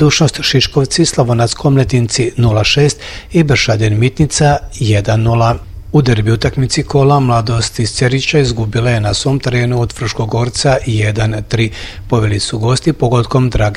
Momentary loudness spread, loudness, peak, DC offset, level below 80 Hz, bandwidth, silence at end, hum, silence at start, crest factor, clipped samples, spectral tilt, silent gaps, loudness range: 5 LU; -13 LUFS; 0 dBFS; under 0.1%; -30 dBFS; 12 kHz; 0 s; none; 0 s; 12 dB; under 0.1%; -5 dB/octave; none; 3 LU